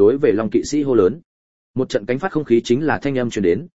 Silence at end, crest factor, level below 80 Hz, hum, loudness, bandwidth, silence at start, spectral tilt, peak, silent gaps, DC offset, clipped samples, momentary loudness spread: 0 s; 16 dB; -50 dBFS; none; -19 LUFS; 8 kHz; 0 s; -6 dB/octave; -2 dBFS; 1.25-1.74 s; 0.8%; under 0.1%; 6 LU